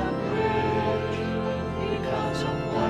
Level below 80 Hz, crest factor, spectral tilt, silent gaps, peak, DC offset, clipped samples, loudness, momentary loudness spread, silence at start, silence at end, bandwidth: -44 dBFS; 14 dB; -7 dB/octave; none; -12 dBFS; under 0.1%; under 0.1%; -27 LUFS; 4 LU; 0 s; 0 s; 12 kHz